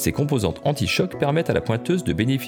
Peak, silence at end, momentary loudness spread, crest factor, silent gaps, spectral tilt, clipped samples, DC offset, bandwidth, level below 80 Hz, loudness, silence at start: -6 dBFS; 0 s; 2 LU; 16 dB; none; -5.5 dB/octave; under 0.1%; under 0.1%; over 20 kHz; -44 dBFS; -22 LUFS; 0 s